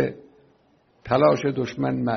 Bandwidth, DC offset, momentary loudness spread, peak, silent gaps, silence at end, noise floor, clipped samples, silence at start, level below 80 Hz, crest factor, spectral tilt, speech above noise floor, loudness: 6.4 kHz; under 0.1%; 7 LU; -4 dBFS; none; 0 s; -61 dBFS; under 0.1%; 0 s; -56 dBFS; 20 dB; -6 dB/octave; 40 dB; -22 LUFS